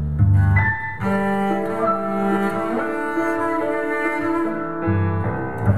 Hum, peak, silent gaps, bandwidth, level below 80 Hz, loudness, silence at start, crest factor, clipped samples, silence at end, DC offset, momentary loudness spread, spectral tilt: none; -4 dBFS; none; 11.5 kHz; -36 dBFS; -21 LUFS; 0 s; 16 dB; under 0.1%; 0 s; 2%; 6 LU; -8.5 dB/octave